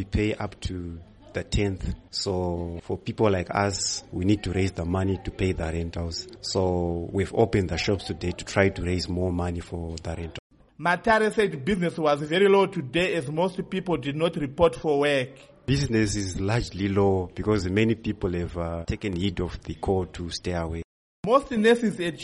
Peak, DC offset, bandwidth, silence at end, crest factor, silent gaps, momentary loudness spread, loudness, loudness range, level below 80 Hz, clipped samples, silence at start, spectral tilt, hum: -6 dBFS; under 0.1%; 11.5 kHz; 0 s; 20 dB; 10.39-10.50 s, 20.84-21.23 s; 12 LU; -26 LUFS; 4 LU; -42 dBFS; under 0.1%; 0 s; -5.5 dB/octave; none